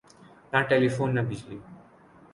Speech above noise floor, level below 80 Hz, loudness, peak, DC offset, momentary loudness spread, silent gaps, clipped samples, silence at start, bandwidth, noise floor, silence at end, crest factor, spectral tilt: 29 dB; -60 dBFS; -26 LUFS; -10 dBFS; under 0.1%; 19 LU; none; under 0.1%; 0.5 s; 11 kHz; -54 dBFS; 0.55 s; 20 dB; -7 dB/octave